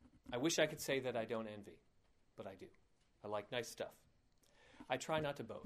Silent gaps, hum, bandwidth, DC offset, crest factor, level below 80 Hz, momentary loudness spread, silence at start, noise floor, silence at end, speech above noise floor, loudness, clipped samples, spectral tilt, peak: none; none; 15.5 kHz; under 0.1%; 24 dB; -74 dBFS; 19 LU; 0 s; -73 dBFS; 0 s; 31 dB; -42 LUFS; under 0.1%; -3.5 dB/octave; -22 dBFS